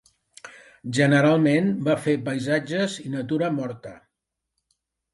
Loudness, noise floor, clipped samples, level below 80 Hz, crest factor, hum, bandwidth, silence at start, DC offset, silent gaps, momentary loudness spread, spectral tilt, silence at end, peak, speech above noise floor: -23 LUFS; -83 dBFS; under 0.1%; -66 dBFS; 18 dB; none; 11.5 kHz; 0.45 s; under 0.1%; none; 21 LU; -6.5 dB/octave; 1.2 s; -6 dBFS; 60 dB